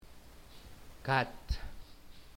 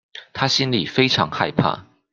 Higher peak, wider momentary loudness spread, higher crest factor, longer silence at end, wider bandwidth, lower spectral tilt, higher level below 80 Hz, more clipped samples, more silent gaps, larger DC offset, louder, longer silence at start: second, -14 dBFS vs -2 dBFS; first, 25 LU vs 9 LU; about the same, 24 dB vs 20 dB; second, 0 s vs 0.3 s; first, 16.5 kHz vs 7.6 kHz; about the same, -5.5 dB/octave vs -4.5 dB/octave; first, -48 dBFS vs -54 dBFS; neither; neither; neither; second, -36 LUFS vs -19 LUFS; second, 0 s vs 0.15 s